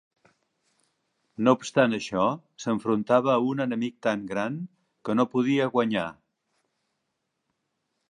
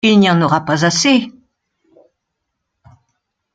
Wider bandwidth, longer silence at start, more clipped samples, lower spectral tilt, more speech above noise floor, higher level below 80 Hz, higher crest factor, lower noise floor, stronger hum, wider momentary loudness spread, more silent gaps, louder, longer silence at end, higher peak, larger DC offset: about the same, 10 kHz vs 9.2 kHz; first, 1.4 s vs 0.05 s; neither; first, -6 dB/octave vs -4.5 dB/octave; second, 55 dB vs 62 dB; second, -68 dBFS vs -58 dBFS; first, 22 dB vs 16 dB; first, -80 dBFS vs -75 dBFS; neither; first, 11 LU vs 5 LU; neither; second, -26 LUFS vs -13 LUFS; second, 2 s vs 2.25 s; second, -6 dBFS vs 0 dBFS; neither